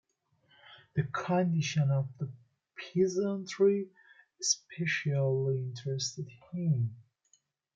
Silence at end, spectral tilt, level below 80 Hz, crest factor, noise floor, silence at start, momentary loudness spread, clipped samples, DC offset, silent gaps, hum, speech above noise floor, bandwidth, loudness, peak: 0.75 s; -5 dB/octave; -74 dBFS; 20 dB; -72 dBFS; 0.7 s; 13 LU; under 0.1%; under 0.1%; none; none; 41 dB; 9.2 kHz; -32 LUFS; -12 dBFS